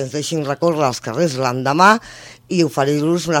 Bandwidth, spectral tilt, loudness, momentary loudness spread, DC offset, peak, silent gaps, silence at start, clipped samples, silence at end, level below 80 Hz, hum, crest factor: 18 kHz; -5 dB/octave; -17 LUFS; 9 LU; under 0.1%; 0 dBFS; none; 0 s; under 0.1%; 0 s; -56 dBFS; none; 18 dB